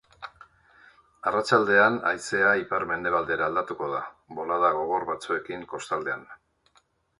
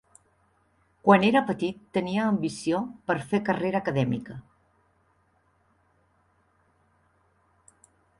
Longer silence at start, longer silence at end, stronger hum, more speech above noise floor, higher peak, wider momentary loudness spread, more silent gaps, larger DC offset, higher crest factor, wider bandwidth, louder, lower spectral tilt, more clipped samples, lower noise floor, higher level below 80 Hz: second, 0.2 s vs 1.05 s; second, 0.85 s vs 3.8 s; neither; about the same, 40 dB vs 42 dB; about the same, -4 dBFS vs -4 dBFS; first, 16 LU vs 11 LU; neither; neither; about the same, 22 dB vs 24 dB; about the same, 11.5 kHz vs 11.5 kHz; about the same, -25 LUFS vs -26 LUFS; second, -4.5 dB/octave vs -6.5 dB/octave; neither; about the same, -66 dBFS vs -67 dBFS; about the same, -64 dBFS vs -64 dBFS